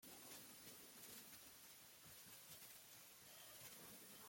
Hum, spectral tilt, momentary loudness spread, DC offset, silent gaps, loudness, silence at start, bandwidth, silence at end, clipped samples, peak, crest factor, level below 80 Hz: none; -1.5 dB/octave; 3 LU; under 0.1%; none; -59 LUFS; 0 s; 16.5 kHz; 0 s; under 0.1%; -44 dBFS; 18 dB; -88 dBFS